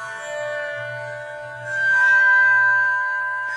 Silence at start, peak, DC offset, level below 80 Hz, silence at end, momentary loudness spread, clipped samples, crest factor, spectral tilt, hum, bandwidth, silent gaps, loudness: 0 s; -8 dBFS; under 0.1%; -70 dBFS; 0 s; 18 LU; under 0.1%; 12 dB; -2 dB/octave; none; 10.5 kHz; none; -17 LUFS